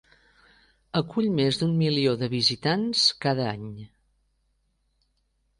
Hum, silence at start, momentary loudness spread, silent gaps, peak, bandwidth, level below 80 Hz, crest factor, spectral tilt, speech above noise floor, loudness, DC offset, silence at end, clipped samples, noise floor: none; 0.95 s; 10 LU; none; -8 dBFS; 11 kHz; -62 dBFS; 20 dB; -5 dB/octave; 47 dB; -24 LUFS; under 0.1%; 1.75 s; under 0.1%; -71 dBFS